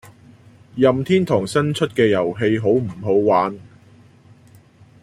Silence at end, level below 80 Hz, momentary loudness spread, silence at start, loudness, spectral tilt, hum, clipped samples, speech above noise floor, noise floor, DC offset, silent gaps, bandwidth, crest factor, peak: 1.4 s; -56 dBFS; 4 LU; 0.05 s; -18 LUFS; -6.5 dB/octave; none; under 0.1%; 31 dB; -49 dBFS; under 0.1%; none; 14.5 kHz; 18 dB; -2 dBFS